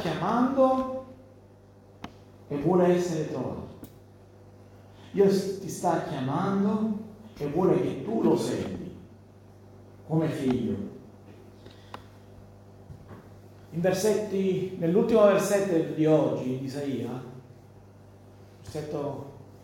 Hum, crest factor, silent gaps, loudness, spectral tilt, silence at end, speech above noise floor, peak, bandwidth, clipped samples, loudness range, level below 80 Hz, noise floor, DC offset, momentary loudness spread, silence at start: 50 Hz at -50 dBFS; 20 dB; none; -27 LUFS; -6.5 dB/octave; 0.05 s; 28 dB; -8 dBFS; 17 kHz; under 0.1%; 9 LU; -60 dBFS; -53 dBFS; under 0.1%; 23 LU; 0 s